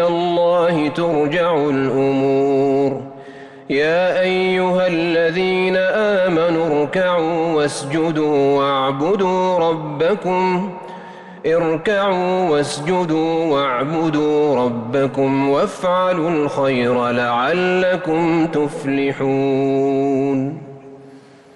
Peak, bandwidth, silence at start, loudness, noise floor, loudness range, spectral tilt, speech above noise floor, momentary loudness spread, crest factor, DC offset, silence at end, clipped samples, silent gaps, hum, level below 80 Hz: -8 dBFS; 11.5 kHz; 0 s; -17 LUFS; -43 dBFS; 2 LU; -6 dB/octave; 26 dB; 4 LU; 10 dB; under 0.1%; 0.35 s; under 0.1%; none; none; -54 dBFS